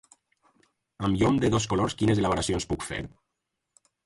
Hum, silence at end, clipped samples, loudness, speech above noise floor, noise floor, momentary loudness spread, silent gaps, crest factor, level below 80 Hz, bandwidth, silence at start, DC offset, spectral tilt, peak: none; 1 s; under 0.1%; -26 LUFS; 57 dB; -83 dBFS; 11 LU; none; 18 dB; -46 dBFS; 11.5 kHz; 1 s; under 0.1%; -5.5 dB/octave; -10 dBFS